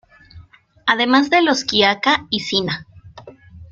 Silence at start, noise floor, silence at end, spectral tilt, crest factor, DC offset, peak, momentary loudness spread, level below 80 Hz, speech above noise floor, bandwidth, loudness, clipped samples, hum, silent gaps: 0.35 s; -46 dBFS; 0.05 s; -3.5 dB/octave; 18 dB; under 0.1%; -2 dBFS; 9 LU; -54 dBFS; 29 dB; 7.6 kHz; -16 LUFS; under 0.1%; none; none